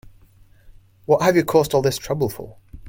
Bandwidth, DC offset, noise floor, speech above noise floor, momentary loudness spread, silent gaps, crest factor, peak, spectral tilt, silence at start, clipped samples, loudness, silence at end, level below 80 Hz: 17 kHz; under 0.1%; -51 dBFS; 32 dB; 20 LU; none; 20 dB; -2 dBFS; -5.5 dB/octave; 0.05 s; under 0.1%; -19 LUFS; 0 s; -48 dBFS